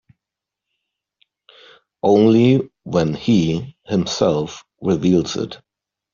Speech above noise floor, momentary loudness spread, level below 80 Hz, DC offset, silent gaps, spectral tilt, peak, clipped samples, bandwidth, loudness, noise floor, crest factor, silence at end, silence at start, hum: 68 dB; 13 LU; -54 dBFS; under 0.1%; none; -6.5 dB/octave; -2 dBFS; under 0.1%; 7.4 kHz; -18 LUFS; -85 dBFS; 16 dB; 0.6 s; 2.05 s; none